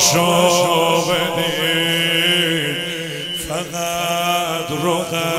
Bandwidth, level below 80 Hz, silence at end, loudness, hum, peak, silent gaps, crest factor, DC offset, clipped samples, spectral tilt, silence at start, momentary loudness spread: 16 kHz; -50 dBFS; 0 s; -17 LUFS; none; 0 dBFS; none; 16 dB; under 0.1%; under 0.1%; -3 dB/octave; 0 s; 9 LU